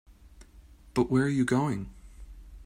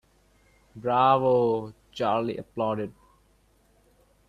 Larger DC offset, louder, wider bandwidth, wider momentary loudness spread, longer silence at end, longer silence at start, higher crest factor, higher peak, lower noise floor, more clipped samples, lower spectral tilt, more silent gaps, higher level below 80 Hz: neither; second, -28 LUFS vs -25 LUFS; first, 12.5 kHz vs 10.5 kHz; second, 11 LU vs 14 LU; second, 0 s vs 1.4 s; second, 0.1 s vs 0.75 s; about the same, 18 dB vs 20 dB; second, -12 dBFS vs -8 dBFS; second, -53 dBFS vs -63 dBFS; neither; about the same, -7 dB/octave vs -7.5 dB/octave; neither; first, -50 dBFS vs -62 dBFS